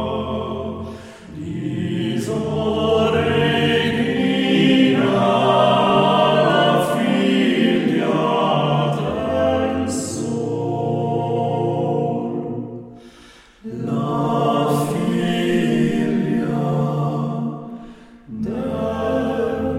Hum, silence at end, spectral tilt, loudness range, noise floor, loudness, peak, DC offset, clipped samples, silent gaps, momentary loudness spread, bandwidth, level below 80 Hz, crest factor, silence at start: none; 0 s; -6 dB/octave; 7 LU; -46 dBFS; -19 LUFS; -2 dBFS; under 0.1%; under 0.1%; none; 13 LU; 16 kHz; -48 dBFS; 16 dB; 0 s